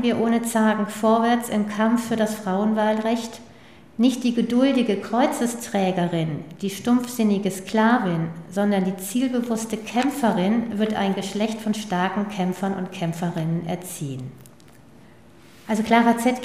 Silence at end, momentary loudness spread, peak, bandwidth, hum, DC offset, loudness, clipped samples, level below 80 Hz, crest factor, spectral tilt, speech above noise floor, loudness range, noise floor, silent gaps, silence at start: 0 s; 8 LU; -2 dBFS; 15.5 kHz; none; 0.2%; -23 LUFS; under 0.1%; -62 dBFS; 20 dB; -5.5 dB/octave; 28 dB; 5 LU; -49 dBFS; none; 0 s